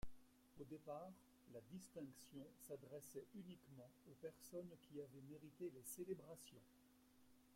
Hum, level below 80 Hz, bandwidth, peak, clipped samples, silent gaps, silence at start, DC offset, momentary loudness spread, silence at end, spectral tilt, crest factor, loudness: none; -74 dBFS; 16.5 kHz; -38 dBFS; under 0.1%; none; 0 s; under 0.1%; 10 LU; 0 s; -5.5 dB/octave; 18 dB; -58 LUFS